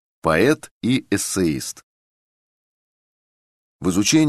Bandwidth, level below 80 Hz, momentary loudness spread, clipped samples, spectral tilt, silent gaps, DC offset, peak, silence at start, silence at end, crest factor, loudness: 13 kHz; -50 dBFS; 10 LU; under 0.1%; -4.5 dB/octave; 0.71-0.81 s, 1.83-3.79 s; under 0.1%; -2 dBFS; 0.25 s; 0 s; 20 dB; -20 LUFS